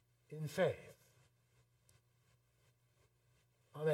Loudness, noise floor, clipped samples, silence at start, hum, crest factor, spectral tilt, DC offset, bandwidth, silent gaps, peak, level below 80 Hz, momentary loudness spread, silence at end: -41 LUFS; -76 dBFS; under 0.1%; 0.3 s; 60 Hz at -80 dBFS; 24 dB; -6 dB/octave; under 0.1%; 17 kHz; none; -22 dBFS; -82 dBFS; 20 LU; 0 s